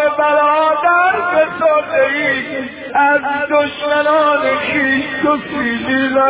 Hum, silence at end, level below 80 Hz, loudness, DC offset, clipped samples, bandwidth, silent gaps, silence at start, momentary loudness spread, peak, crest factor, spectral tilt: none; 0 s; -50 dBFS; -14 LUFS; under 0.1%; under 0.1%; 4 kHz; none; 0 s; 5 LU; -2 dBFS; 12 dB; -7.5 dB/octave